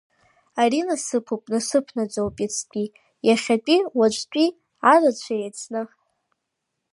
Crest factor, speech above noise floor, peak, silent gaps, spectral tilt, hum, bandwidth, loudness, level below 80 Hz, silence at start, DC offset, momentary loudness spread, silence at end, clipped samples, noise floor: 20 dB; 58 dB; -4 dBFS; none; -3.5 dB/octave; none; 11.5 kHz; -22 LUFS; -62 dBFS; 0.55 s; under 0.1%; 13 LU; 1.1 s; under 0.1%; -79 dBFS